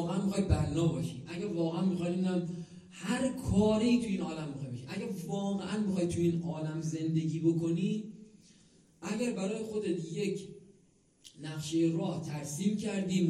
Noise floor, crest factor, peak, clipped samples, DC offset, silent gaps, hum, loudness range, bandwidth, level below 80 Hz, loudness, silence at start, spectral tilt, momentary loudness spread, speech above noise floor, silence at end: -66 dBFS; 18 dB; -14 dBFS; under 0.1%; under 0.1%; none; none; 5 LU; 13 kHz; -54 dBFS; -33 LUFS; 0 s; -6.5 dB/octave; 11 LU; 34 dB; 0 s